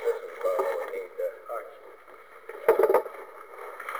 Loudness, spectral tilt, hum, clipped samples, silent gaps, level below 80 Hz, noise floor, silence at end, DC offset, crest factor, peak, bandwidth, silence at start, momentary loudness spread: -28 LUFS; -4 dB/octave; none; under 0.1%; none; -74 dBFS; -50 dBFS; 0 s; 0.1%; 22 dB; -6 dBFS; over 20 kHz; 0 s; 24 LU